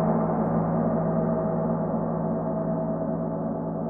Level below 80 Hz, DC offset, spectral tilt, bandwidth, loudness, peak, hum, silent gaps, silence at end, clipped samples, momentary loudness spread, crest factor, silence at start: -48 dBFS; under 0.1%; -14.5 dB/octave; 2.3 kHz; -26 LUFS; -12 dBFS; none; none; 0 s; under 0.1%; 4 LU; 12 dB; 0 s